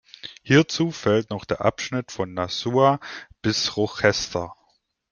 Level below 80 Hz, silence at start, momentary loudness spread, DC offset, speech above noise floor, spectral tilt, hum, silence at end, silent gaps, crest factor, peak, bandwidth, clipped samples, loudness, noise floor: -56 dBFS; 0.25 s; 11 LU; under 0.1%; 45 dB; -5 dB/octave; none; 0.6 s; none; 20 dB; -2 dBFS; 10 kHz; under 0.1%; -23 LUFS; -67 dBFS